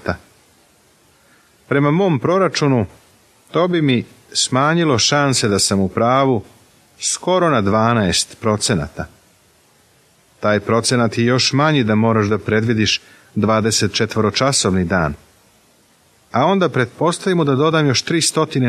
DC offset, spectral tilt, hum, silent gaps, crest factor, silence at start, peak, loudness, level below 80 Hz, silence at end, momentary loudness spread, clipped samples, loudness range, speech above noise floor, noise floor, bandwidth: under 0.1%; -4.5 dB/octave; none; none; 16 dB; 0.05 s; -2 dBFS; -16 LUFS; -48 dBFS; 0 s; 7 LU; under 0.1%; 3 LU; 38 dB; -54 dBFS; 14.5 kHz